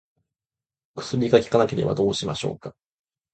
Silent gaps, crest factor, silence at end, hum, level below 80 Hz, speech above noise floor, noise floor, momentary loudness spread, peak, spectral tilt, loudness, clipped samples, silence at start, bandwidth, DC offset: none; 22 dB; 0.65 s; none; -54 dBFS; over 68 dB; under -90 dBFS; 19 LU; -2 dBFS; -6 dB/octave; -23 LUFS; under 0.1%; 0.95 s; 9 kHz; under 0.1%